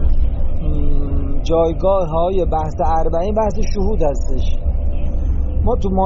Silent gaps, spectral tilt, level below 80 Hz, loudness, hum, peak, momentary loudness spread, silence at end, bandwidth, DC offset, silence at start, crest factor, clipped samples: none; -8 dB/octave; -18 dBFS; -20 LUFS; none; -4 dBFS; 6 LU; 0 s; 7.2 kHz; under 0.1%; 0 s; 10 dB; under 0.1%